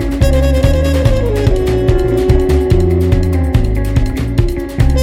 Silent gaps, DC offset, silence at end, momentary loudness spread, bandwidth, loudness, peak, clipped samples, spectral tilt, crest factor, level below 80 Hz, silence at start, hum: none; under 0.1%; 0 s; 4 LU; 16 kHz; -13 LUFS; 0 dBFS; under 0.1%; -7.5 dB/octave; 10 dB; -16 dBFS; 0 s; none